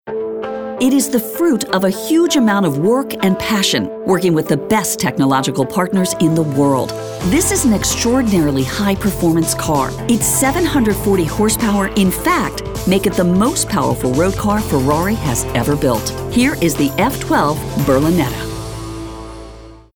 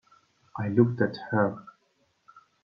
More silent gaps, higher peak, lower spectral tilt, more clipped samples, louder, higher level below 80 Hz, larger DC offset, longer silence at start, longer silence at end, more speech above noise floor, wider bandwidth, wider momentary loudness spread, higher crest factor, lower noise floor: neither; first, -2 dBFS vs -8 dBFS; second, -4.5 dB/octave vs -10 dB/octave; neither; first, -15 LUFS vs -27 LUFS; first, -34 dBFS vs -68 dBFS; neither; second, 0.05 s vs 0.55 s; about the same, 0.15 s vs 0.25 s; second, 21 dB vs 45 dB; first, over 20 kHz vs 5.6 kHz; second, 7 LU vs 17 LU; second, 14 dB vs 22 dB; second, -36 dBFS vs -71 dBFS